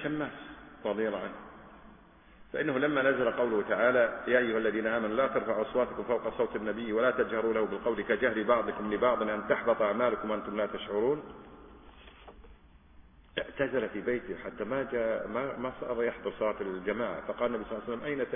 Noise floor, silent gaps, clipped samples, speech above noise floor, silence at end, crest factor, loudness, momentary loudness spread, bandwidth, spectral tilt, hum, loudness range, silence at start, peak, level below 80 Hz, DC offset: -56 dBFS; none; under 0.1%; 26 dB; 0 s; 20 dB; -31 LUFS; 10 LU; 3.7 kHz; -3.5 dB/octave; none; 8 LU; 0 s; -12 dBFS; -58 dBFS; under 0.1%